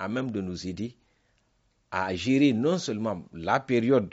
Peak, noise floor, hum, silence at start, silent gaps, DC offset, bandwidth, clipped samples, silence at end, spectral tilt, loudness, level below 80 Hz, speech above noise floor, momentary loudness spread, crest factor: -10 dBFS; -70 dBFS; none; 0 s; none; under 0.1%; 8 kHz; under 0.1%; 0 s; -5.5 dB/octave; -27 LUFS; -60 dBFS; 43 dB; 12 LU; 18 dB